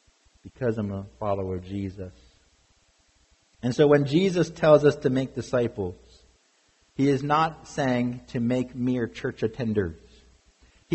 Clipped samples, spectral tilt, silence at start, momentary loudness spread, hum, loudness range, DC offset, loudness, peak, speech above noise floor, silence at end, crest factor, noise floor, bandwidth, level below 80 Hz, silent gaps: under 0.1%; -7 dB/octave; 0.45 s; 14 LU; none; 10 LU; under 0.1%; -25 LUFS; -6 dBFS; 40 dB; 0 s; 20 dB; -65 dBFS; 8.4 kHz; -56 dBFS; none